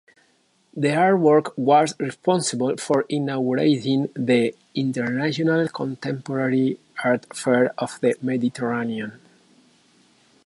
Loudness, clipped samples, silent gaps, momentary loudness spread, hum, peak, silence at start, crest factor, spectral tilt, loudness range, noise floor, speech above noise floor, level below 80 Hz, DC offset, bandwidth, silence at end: -22 LUFS; under 0.1%; none; 8 LU; none; -4 dBFS; 0.75 s; 18 dB; -5.5 dB/octave; 4 LU; -63 dBFS; 42 dB; -70 dBFS; under 0.1%; 11.5 kHz; 1.3 s